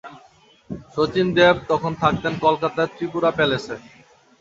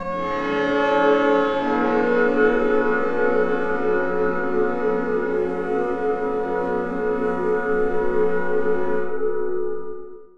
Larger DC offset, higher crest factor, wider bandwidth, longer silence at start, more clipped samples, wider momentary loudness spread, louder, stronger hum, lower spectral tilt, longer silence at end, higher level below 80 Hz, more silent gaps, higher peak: second, under 0.1% vs 3%; about the same, 20 dB vs 16 dB; about the same, 7.8 kHz vs 7.2 kHz; about the same, 0.05 s vs 0 s; neither; first, 17 LU vs 7 LU; about the same, -20 LUFS vs -21 LUFS; neither; about the same, -6 dB/octave vs -7 dB/octave; first, 0.6 s vs 0 s; about the same, -50 dBFS vs -46 dBFS; neither; first, -2 dBFS vs -6 dBFS